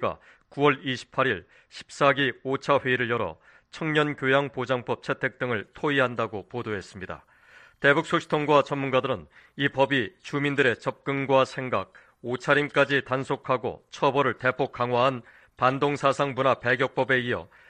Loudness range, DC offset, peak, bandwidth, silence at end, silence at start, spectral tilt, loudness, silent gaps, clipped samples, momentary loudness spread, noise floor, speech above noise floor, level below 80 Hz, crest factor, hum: 2 LU; under 0.1%; -6 dBFS; 9.8 kHz; 0.25 s; 0 s; -5.5 dB/octave; -25 LUFS; none; under 0.1%; 12 LU; -54 dBFS; 29 dB; -62 dBFS; 20 dB; none